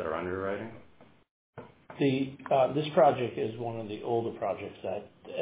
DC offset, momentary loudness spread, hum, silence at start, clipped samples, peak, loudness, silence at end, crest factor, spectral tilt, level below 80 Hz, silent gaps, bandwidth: under 0.1%; 19 LU; none; 0 s; under 0.1%; -10 dBFS; -30 LUFS; 0 s; 20 dB; -5.5 dB/octave; -62 dBFS; 1.31-1.53 s; 4 kHz